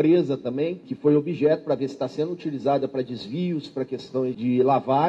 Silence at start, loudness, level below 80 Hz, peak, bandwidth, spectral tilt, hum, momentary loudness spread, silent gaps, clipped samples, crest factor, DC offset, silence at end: 0 s; -25 LUFS; -66 dBFS; -8 dBFS; 8 kHz; -8.5 dB/octave; none; 9 LU; none; under 0.1%; 14 dB; under 0.1%; 0 s